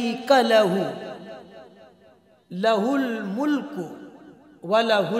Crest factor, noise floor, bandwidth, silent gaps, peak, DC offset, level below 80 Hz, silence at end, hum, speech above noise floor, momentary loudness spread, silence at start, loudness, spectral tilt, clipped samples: 18 dB; -56 dBFS; 15.5 kHz; none; -6 dBFS; under 0.1%; -76 dBFS; 0 s; none; 34 dB; 21 LU; 0 s; -22 LUFS; -5.5 dB/octave; under 0.1%